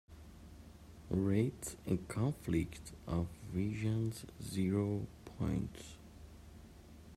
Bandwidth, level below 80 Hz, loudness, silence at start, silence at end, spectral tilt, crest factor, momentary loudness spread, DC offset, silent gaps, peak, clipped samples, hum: 15 kHz; -56 dBFS; -38 LUFS; 0.1 s; 0 s; -7 dB/octave; 18 dB; 22 LU; under 0.1%; none; -22 dBFS; under 0.1%; none